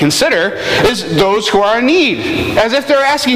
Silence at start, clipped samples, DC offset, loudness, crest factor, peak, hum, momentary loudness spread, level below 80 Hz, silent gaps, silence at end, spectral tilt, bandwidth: 0 s; under 0.1%; under 0.1%; -12 LUFS; 10 dB; -2 dBFS; none; 3 LU; -40 dBFS; none; 0 s; -4 dB/octave; 16 kHz